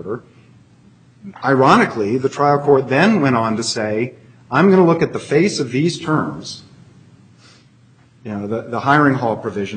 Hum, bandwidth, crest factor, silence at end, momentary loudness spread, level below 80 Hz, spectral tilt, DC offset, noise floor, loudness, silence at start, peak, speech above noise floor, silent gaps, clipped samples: none; 9.4 kHz; 18 dB; 0 s; 15 LU; -58 dBFS; -6 dB/octave; under 0.1%; -50 dBFS; -16 LUFS; 0 s; 0 dBFS; 34 dB; none; under 0.1%